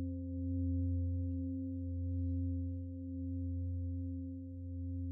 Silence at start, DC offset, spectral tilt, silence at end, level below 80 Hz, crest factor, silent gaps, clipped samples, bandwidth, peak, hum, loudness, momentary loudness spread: 0 s; under 0.1%; -20.5 dB/octave; 0 s; -56 dBFS; 10 dB; none; under 0.1%; 0.6 kHz; -28 dBFS; none; -40 LUFS; 7 LU